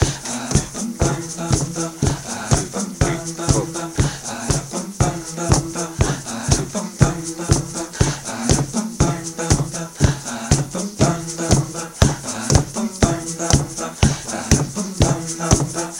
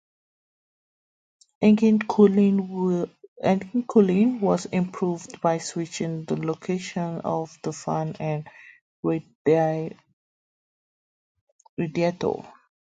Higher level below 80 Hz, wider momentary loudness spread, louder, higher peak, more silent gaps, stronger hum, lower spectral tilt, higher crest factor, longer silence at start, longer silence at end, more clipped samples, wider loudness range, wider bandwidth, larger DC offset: first, -30 dBFS vs -66 dBFS; second, 7 LU vs 12 LU; first, -20 LUFS vs -24 LUFS; first, 0 dBFS vs -4 dBFS; second, none vs 3.28-3.36 s, 8.81-9.03 s, 9.35-9.45 s, 10.13-11.35 s, 11.41-11.59 s, 11.69-11.77 s; neither; second, -4.5 dB/octave vs -7 dB/octave; about the same, 20 dB vs 20 dB; second, 0 s vs 1.6 s; second, 0 s vs 0.35 s; neither; second, 2 LU vs 8 LU; first, 16.5 kHz vs 9.2 kHz; neither